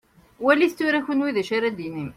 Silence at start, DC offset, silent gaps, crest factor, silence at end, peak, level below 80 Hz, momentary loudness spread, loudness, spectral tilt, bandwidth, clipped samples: 0.4 s; under 0.1%; none; 20 dB; 0.05 s; -4 dBFS; -62 dBFS; 7 LU; -22 LUFS; -5.5 dB/octave; 15 kHz; under 0.1%